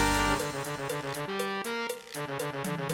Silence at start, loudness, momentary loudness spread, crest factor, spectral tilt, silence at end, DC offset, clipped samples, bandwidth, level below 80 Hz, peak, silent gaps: 0 s; -32 LUFS; 8 LU; 18 dB; -4 dB/octave; 0 s; under 0.1%; under 0.1%; 18 kHz; -46 dBFS; -14 dBFS; none